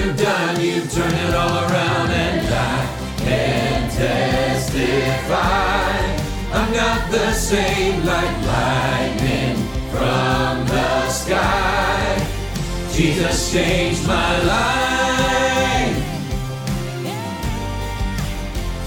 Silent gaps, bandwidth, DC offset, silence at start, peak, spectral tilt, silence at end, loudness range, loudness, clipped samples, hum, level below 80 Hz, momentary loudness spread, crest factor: none; 18.5 kHz; under 0.1%; 0 s; -4 dBFS; -4.5 dB/octave; 0 s; 1 LU; -19 LUFS; under 0.1%; none; -28 dBFS; 8 LU; 16 dB